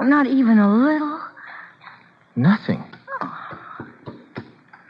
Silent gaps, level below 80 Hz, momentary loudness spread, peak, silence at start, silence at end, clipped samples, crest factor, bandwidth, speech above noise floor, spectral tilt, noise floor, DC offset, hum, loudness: none; -68 dBFS; 23 LU; -4 dBFS; 0 s; 0.45 s; under 0.1%; 16 dB; 5.4 kHz; 31 dB; -9.5 dB/octave; -47 dBFS; under 0.1%; none; -19 LUFS